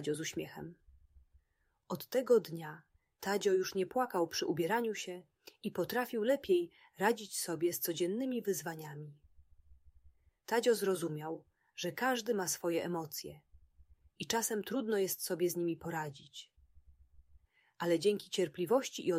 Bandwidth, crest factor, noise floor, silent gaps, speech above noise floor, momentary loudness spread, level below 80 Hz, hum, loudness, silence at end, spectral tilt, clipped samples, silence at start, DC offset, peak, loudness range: 16 kHz; 20 dB; -78 dBFS; none; 43 dB; 16 LU; -72 dBFS; none; -35 LUFS; 0 s; -4 dB/octave; under 0.1%; 0 s; under 0.1%; -16 dBFS; 4 LU